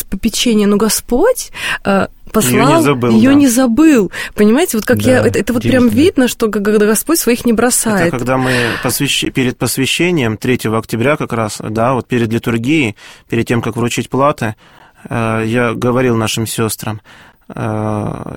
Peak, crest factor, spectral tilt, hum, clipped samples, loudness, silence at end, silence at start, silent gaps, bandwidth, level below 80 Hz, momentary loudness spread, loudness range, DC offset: 0 dBFS; 12 dB; -4.5 dB/octave; none; under 0.1%; -13 LUFS; 0 s; 0 s; none; 17 kHz; -36 dBFS; 9 LU; 6 LU; 0.6%